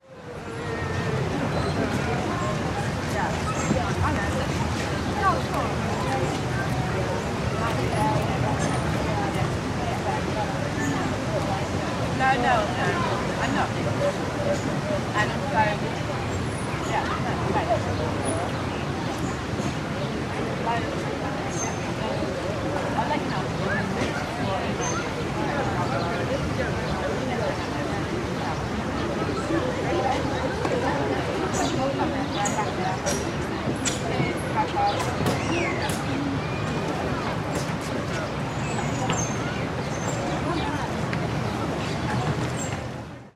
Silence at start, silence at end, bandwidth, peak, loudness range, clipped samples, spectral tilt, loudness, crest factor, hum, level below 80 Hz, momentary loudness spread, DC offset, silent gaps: 0.05 s; 0.05 s; 14 kHz; -8 dBFS; 3 LU; under 0.1%; -5.5 dB/octave; -26 LUFS; 18 dB; none; -42 dBFS; 4 LU; under 0.1%; none